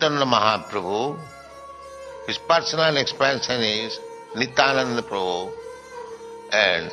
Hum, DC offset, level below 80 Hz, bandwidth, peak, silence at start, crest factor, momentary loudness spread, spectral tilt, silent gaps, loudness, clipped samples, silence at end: none; under 0.1%; -60 dBFS; 12 kHz; 0 dBFS; 0 s; 22 dB; 20 LU; -3.5 dB/octave; none; -21 LUFS; under 0.1%; 0 s